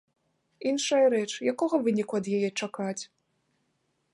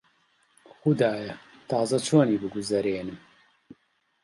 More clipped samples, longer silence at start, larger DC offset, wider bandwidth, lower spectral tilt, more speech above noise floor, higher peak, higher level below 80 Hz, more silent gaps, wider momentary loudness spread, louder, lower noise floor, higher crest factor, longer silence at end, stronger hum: neither; second, 0.6 s vs 0.85 s; neither; about the same, 11.5 kHz vs 11.5 kHz; second, -4.5 dB/octave vs -6 dB/octave; about the same, 48 dB vs 45 dB; second, -12 dBFS vs -8 dBFS; second, -78 dBFS vs -64 dBFS; neither; second, 11 LU vs 17 LU; about the same, -28 LUFS vs -26 LUFS; first, -75 dBFS vs -70 dBFS; about the same, 16 dB vs 20 dB; about the same, 1.1 s vs 1.05 s; neither